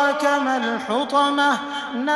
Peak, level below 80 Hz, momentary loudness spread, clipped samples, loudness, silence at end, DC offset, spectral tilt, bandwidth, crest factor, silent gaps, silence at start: -6 dBFS; -66 dBFS; 7 LU; under 0.1%; -20 LUFS; 0 s; under 0.1%; -3 dB/octave; 13 kHz; 14 dB; none; 0 s